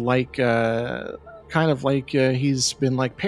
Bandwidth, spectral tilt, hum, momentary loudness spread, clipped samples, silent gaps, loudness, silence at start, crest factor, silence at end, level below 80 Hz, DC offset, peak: 12.5 kHz; -5 dB/octave; none; 9 LU; under 0.1%; none; -22 LUFS; 0 s; 18 dB; 0 s; -52 dBFS; under 0.1%; -4 dBFS